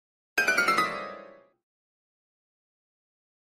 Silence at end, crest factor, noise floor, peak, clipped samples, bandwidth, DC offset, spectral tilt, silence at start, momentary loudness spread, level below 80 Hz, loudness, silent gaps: 2.2 s; 22 dB; -49 dBFS; -12 dBFS; under 0.1%; 15.5 kHz; under 0.1%; -1.5 dB/octave; 0.35 s; 18 LU; -70 dBFS; -26 LUFS; none